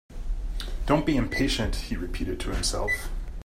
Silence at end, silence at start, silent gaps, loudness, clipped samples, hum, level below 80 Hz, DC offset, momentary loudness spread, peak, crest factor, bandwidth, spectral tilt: 0 s; 0.1 s; none; -28 LUFS; under 0.1%; none; -32 dBFS; under 0.1%; 11 LU; -8 dBFS; 20 dB; 15.5 kHz; -4.5 dB/octave